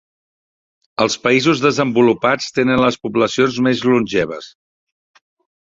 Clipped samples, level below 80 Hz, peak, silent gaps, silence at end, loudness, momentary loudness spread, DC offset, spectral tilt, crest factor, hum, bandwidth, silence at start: under 0.1%; -52 dBFS; 0 dBFS; none; 1.1 s; -16 LUFS; 6 LU; under 0.1%; -5 dB/octave; 18 dB; none; 7.8 kHz; 1 s